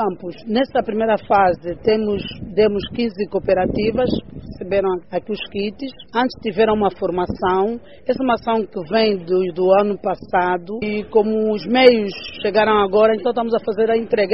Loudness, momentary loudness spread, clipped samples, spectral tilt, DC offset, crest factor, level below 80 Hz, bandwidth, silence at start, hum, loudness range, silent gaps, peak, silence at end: -19 LUFS; 9 LU; under 0.1%; -4 dB/octave; 0.6%; 18 dB; -46 dBFS; 5.8 kHz; 0 s; none; 5 LU; none; 0 dBFS; 0 s